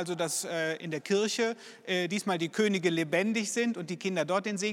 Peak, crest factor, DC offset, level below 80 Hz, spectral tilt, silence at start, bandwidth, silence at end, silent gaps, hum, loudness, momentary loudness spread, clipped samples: -14 dBFS; 16 dB; under 0.1%; -84 dBFS; -4 dB/octave; 0 s; 16 kHz; 0 s; none; none; -30 LUFS; 5 LU; under 0.1%